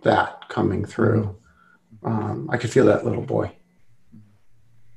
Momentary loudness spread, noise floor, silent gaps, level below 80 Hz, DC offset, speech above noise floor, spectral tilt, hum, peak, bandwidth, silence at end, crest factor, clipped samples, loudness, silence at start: 10 LU; -57 dBFS; none; -56 dBFS; under 0.1%; 36 dB; -7 dB/octave; none; -2 dBFS; 11 kHz; 0 s; 20 dB; under 0.1%; -23 LUFS; 0.05 s